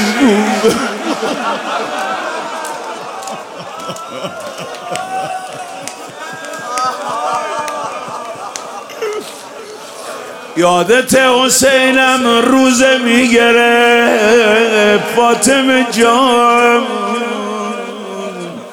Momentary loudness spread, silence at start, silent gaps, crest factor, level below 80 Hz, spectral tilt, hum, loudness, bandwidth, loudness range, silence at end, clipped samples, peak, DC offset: 17 LU; 0 s; none; 12 dB; -52 dBFS; -3 dB/octave; none; -11 LUFS; 17.5 kHz; 14 LU; 0 s; under 0.1%; 0 dBFS; under 0.1%